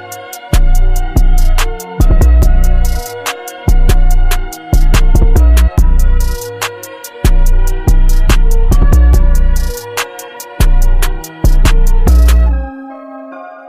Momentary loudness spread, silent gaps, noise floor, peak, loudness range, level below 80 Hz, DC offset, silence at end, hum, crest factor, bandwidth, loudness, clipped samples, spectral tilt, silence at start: 12 LU; none; -29 dBFS; 0 dBFS; 1 LU; -8 dBFS; under 0.1%; 0.2 s; none; 8 dB; 15.5 kHz; -13 LUFS; under 0.1%; -5.5 dB/octave; 0 s